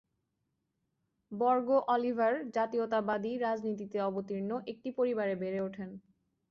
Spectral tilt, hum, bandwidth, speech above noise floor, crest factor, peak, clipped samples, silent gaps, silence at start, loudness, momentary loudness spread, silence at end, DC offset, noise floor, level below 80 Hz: -7.5 dB/octave; none; 7 kHz; 50 dB; 16 dB; -18 dBFS; under 0.1%; none; 1.3 s; -33 LUFS; 11 LU; 0.5 s; under 0.1%; -82 dBFS; -76 dBFS